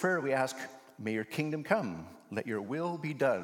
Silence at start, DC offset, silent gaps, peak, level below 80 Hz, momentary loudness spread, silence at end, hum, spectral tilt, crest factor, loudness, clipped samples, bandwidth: 0 s; under 0.1%; none; -12 dBFS; -80 dBFS; 11 LU; 0 s; none; -6 dB/octave; 22 dB; -34 LUFS; under 0.1%; 17.5 kHz